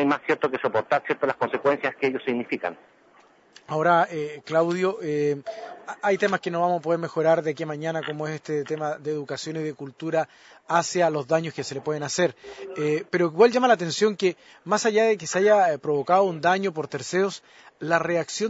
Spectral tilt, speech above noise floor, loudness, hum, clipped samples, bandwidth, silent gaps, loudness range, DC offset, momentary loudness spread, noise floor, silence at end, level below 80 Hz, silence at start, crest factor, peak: -4.5 dB/octave; 32 dB; -24 LUFS; none; under 0.1%; 8 kHz; none; 5 LU; under 0.1%; 11 LU; -56 dBFS; 0 s; -72 dBFS; 0 s; 18 dB; -6 dBFS